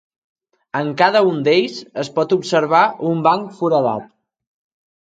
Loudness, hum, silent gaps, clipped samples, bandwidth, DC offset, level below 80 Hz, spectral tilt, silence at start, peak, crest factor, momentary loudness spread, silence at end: -17 LUFS; none; none; under 0.1%; 9.2 kHz; under 0.1%; -68 dBFS; -5.5 dB/octave; 0.75 s; 0 dBFS; 18 dB; 10 LU; 1.05 s